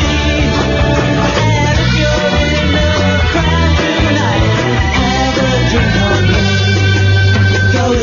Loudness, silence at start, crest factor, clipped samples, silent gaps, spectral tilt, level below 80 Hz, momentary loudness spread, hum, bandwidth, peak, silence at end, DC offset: -12 LUFS; 0 s; 10 dB; under 0.1%; none; -5.5 dB/octave; -20 dBFS; 2 LU; none; 7.2 kHz; 0 dBFS; 0 s; under 0.1%